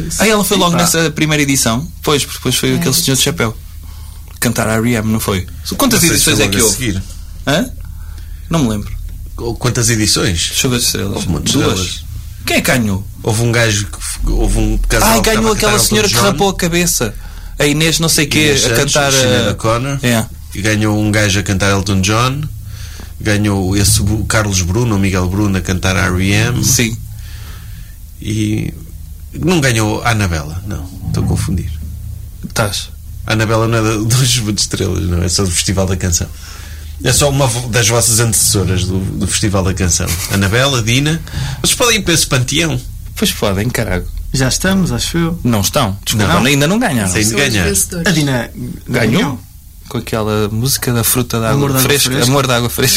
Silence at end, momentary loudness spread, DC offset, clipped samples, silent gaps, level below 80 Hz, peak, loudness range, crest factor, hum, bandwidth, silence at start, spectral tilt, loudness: 0 s; 15 LU; under 0.1%; under 0.1%; none; -26 dBFS; 0 dBFS; 5 LU; 14 dB; none; 16.5 kHz; 0 s; -4 dB/octave; -13 LUFS